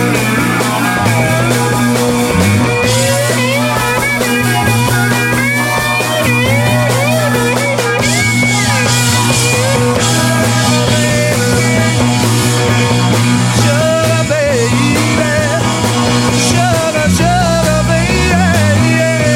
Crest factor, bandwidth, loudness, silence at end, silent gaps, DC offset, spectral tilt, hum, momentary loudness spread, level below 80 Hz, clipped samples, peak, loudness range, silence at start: 10 dB; 16.5 kHz; -11 LUFS; 0 s; none; under 0.1%; -4.5 dB/octave; none; 2 LU; -32 dBFS; under 0.1%; 0 dBFS; 1 LU; 0 s